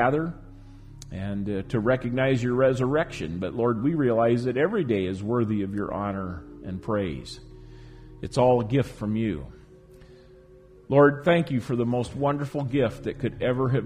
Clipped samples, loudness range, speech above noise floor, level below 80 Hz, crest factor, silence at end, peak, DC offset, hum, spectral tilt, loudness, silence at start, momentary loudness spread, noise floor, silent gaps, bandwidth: under 0.1%; 4 LU; 27 dB; -48 dBFS; 20 dB; 0 s; -6 dBFS; under 0.1%; none; -7.5 dB/octave; -25 LUFS; 0 s; 14 LU; -51 dBFS; none; 11.5 kHz